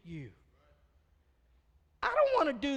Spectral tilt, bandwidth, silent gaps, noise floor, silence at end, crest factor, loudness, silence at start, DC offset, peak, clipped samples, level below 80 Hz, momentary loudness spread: -5.5 dB/octave; 9 kHz; none; -69 dBFS; 0 s; 20 dB; -30 LUFS; 0.05 s; under 0.1%; -16 dBFS; under 0.1%; -62 dBFS; 20 LU